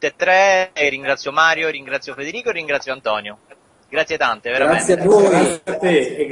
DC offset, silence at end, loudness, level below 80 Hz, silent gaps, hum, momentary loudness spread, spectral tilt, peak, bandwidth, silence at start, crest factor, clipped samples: under 0.1%; 0 s; -17 LUFS; -56 dBFS; none; none; 12 LU; -4 dB/octave; 0 dBFS; 11 kHz; 0 s; 18 dB; under 0.1%